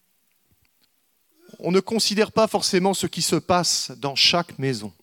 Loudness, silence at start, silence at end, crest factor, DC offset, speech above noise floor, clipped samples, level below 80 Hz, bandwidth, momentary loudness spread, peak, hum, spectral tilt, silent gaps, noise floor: -21 LUFS; 1.6 s; 0.1 s; 18 dB; under 0.1%; 45 dB; under 0.1%; -62 dBFS; 18 kHz; 9 LU; -4 dBFS; none; -3.5 dB/octave; none; -67 dBFS